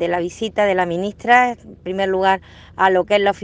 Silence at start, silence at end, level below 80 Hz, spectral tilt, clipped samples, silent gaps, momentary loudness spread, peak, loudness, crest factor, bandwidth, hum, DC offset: 0 s; 0 s; -52 dBFS; -5 dB/octave; under 0.1%; none; 9 LU; 0 dBFS; -18 LUFS; 18 dB; 9.4 kHz; none; under 0.1%